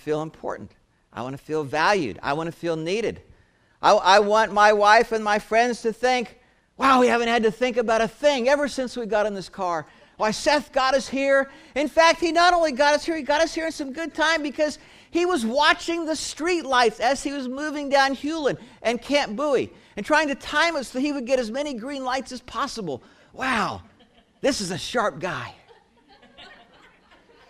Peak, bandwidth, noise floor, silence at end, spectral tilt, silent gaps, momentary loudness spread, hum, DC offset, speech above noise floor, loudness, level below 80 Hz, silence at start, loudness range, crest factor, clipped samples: -2 dBFS; 15 kHz; -59 dBFS; 1 s; -3.5 dB/octave; none; 12 LU; none; under 0.1%; 36 dB; -22 LUFS; -54 dBFS; 0.05 s; 8 LU; 20 dB; under 0.1%